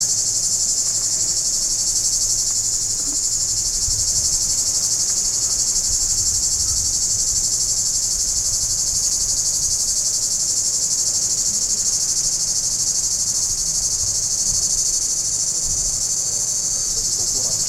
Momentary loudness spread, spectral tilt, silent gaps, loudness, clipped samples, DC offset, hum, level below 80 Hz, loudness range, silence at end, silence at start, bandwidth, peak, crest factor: 2 LU; 0.5 dB/octave; none; -17 LUFS; under 0.1%; under 0.1%; none; -38 dBFS; 1 LU; 0 s; 0 s; 16.5 kHz; -4 dBFS; 16 dB